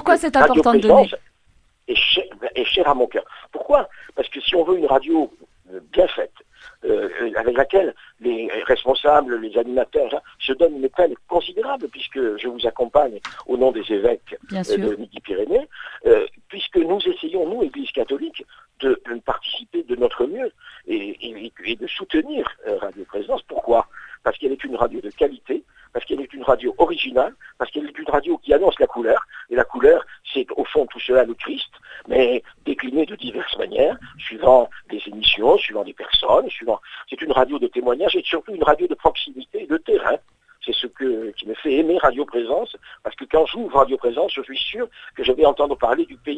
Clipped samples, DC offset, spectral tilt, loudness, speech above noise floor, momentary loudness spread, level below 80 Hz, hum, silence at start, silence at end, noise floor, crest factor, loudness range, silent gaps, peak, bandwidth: under 0.1%; under 0.1%; -5 dB/octave; -20 LUFS; 38 dB; 13 LU; -46 dBFS; none; 0 s; 0 s; -58 dBFS; 20 dB; 6 LU; none; 0 dBFS; 10.5 kHz